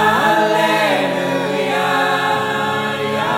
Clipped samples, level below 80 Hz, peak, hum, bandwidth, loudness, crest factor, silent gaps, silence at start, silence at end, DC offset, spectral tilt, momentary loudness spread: under 0.1%; -64 dBFS; -2 dBFS; none; 16.5 kHz; -16 LUFS; 14 dB; none; 0 s; 0 s; under 0.1%; -4 dB/octave; 5 LU